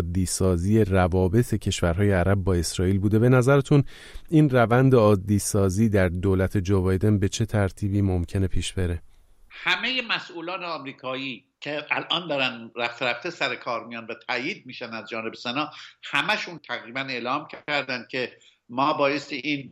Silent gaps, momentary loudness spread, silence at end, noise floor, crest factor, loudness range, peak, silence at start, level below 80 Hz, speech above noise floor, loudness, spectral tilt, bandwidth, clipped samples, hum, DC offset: none; 13 LU; 0 s; -50 dBFS; 18 dB; 8 LU; -6 dBFS; 0 s; -42 dBFS; 27 dB; -24 LUFS; -5.5 dB/octave; 15 kHz; under 0.1%; none; under 0.1%